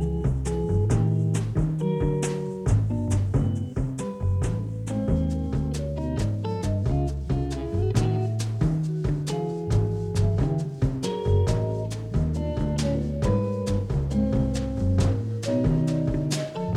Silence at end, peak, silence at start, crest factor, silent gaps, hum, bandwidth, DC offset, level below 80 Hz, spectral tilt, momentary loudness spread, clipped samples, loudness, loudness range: 0 s; -10 dBFS; 0 s; 14 dB; none; none; 12 kHz; under 0.1%; -34 dBFS; -7.5 dB/octave; 5 LU; under 0.1%; -26 LUFS; 2 LU